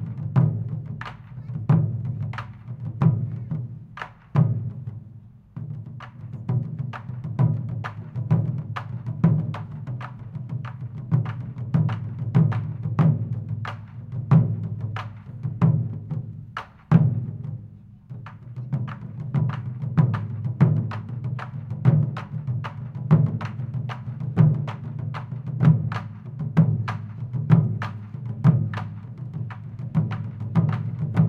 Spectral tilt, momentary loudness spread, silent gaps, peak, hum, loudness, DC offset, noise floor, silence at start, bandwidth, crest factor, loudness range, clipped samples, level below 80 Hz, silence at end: -10 dB/octave; 16 LU; none; -2 dBFS; none; -25 LUFS; under 0.1%; -45 dBFS; 0 s; 4.8 kHz; 22 dB; 4 LU; under 0.1%; -54 dBFS; 0 s